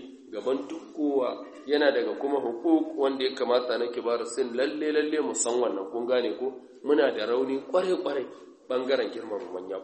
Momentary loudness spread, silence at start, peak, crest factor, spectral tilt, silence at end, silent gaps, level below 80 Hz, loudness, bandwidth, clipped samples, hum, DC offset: 10 LU; 0 s; -10 dBFS; 18 dB; -3 dB/octave; 0 s; none; -78 dBFS; -28 LUFS; 8.4 kHz; under 0.1%; none; under 0.1%